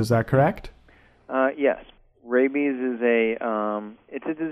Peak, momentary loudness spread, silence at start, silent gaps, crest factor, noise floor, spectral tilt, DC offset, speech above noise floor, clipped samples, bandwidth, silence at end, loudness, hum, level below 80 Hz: -6 dBFS; 12 LU; 0 s; none; 18 dB; -55 dBFS; -7.5 dB/octave; under 0.1%; 32 dB; under 0.1%; 14 kHz; 0 s; -24 LUFS; none; -52 dBFS